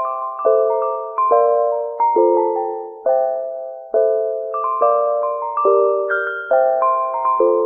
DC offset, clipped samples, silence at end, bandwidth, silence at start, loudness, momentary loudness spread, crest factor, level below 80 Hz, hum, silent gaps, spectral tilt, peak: under 0.1%; under 0.1%; 0 s; 3.4 kHz; 0 s; -18 LUFS; 7 LU; 14 dB; -68 dBFS; none; none; -7.5 dB/octave; -2 dBFS